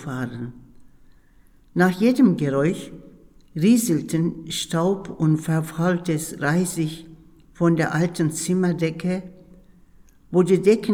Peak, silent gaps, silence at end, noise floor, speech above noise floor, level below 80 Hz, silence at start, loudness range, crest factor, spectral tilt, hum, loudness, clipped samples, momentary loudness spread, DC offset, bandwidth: -4 dBFS; none; 0 s; -53 dBFS; 32 dB; -54 dBFS; 0 s; 3 LU; 18 dB; -6 dB/octave; none; -22 LUFS; under 0.1%; 12 LU; under 0.1%; 16.5 kHz